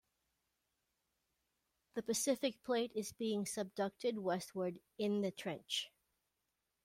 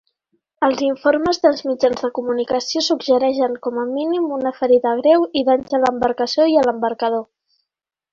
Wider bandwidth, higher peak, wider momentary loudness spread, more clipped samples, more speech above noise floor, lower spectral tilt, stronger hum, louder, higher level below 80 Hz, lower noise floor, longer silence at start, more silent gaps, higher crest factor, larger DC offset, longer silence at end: first, 16.5 kHz vs 7.6 kHz; second, -24 dBFS vs -2 dBFS; about the same, 7 LU vs 7 LU; neither; second, 48 dB vs 65 dB; about the same, -3.5 dB/octave vs -4 dB/octave; neither; second, -40 LUFS vs -18 LUFS; second, -82 dBFS vs -58 dBFS; first, -87 dBFS vs -83 dBFS; first, 1.95 s vs 0.6 s; neither; about the same, 18 dB vs 16 dB; neither; about the same, 0.95 s vs 0.9 s